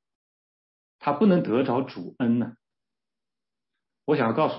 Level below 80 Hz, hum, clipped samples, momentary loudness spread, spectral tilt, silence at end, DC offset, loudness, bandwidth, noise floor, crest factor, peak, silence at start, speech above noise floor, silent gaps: -74 dBFS; none; under 0.1%; 13 LU; -11.5 dB/octave; 0 s; under 0.1%; -25 LUFS; 5.8 kHz; under -90 dBFS; 18 dB; -10 dBFS; 1.05 s; over 67 dB; none